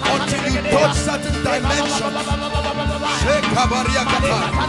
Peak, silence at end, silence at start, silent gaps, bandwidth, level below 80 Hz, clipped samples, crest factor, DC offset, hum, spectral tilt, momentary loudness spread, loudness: -6 dBFS; 0 s; 0 s; none; 11.5 kHz; -30 dBFS; under 0.1%; 14 dB; under 0.1%; none; -4 dB/octave; 5 LU; -18 LUFS